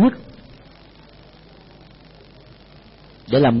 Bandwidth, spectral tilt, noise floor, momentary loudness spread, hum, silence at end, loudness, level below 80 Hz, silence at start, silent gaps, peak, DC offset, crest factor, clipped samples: 5.8 kHz; -11.5 dB/octave; -46 dBFS; 29 LU; none; 0 s; -18 LUFS; -50 dBFS; 0 s; none; -6 dBFS; under 0.1%; 18 dB; under 0.1%